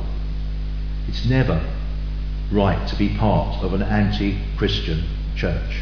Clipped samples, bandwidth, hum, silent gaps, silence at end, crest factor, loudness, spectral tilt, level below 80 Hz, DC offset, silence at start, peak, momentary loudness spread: under 0.1%; 5.4 kHz; 50 Hz at -25 dBFS; none; 0 s; 16 dB; -23 LUFS; -7.5 dB/octave; -24 dBFS; under 0.1%; 0 s; -4 dBFS; 9 LU